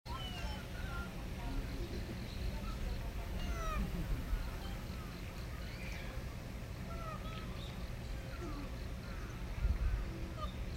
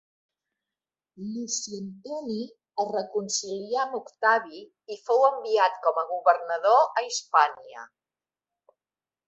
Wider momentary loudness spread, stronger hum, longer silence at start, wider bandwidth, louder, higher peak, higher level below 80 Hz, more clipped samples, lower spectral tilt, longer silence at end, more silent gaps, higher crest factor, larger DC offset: second, 6 LU vs 17 LU; neither; second, 0.05 s vs 1.2 s; first, 16 kHz vs 8.4 kHz; second, -44 LUFS vs -25 LUFS; second, -24 dBFS vs -6 dBFS; first, -42 dBFS vs -80 dBFS; neither; first, -5.5 dB/octave vs -2.5 dB/octave; second, 0 s vs 1.4 s; neither; about the same, 18 dB vs 22 dB; neither